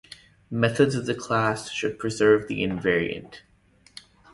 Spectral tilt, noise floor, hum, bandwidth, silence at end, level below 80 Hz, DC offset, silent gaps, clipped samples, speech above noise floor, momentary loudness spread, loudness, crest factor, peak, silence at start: -5.5 dB/octave; -59 dBFS; none; 11.5 kHz; 0.95 s; -54 dBFS; under 0.1%; none; under 0.1%; 35 dB; 9 LU; -24 LUFS; 20 dB; -6 dBFS; 0.5 s